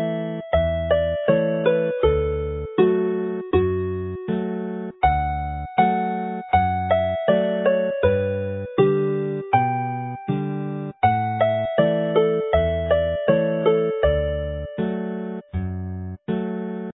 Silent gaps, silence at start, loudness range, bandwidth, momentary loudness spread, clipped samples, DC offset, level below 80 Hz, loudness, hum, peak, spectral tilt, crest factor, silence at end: none; 0 s; 3 LU; 4 kHz; 8 LU; under 0.1%; under 0.1%; -36 dBFS; -22 LUFS; none; -4 dBFS; -12 dB/octave; 18 dB; 0.05 s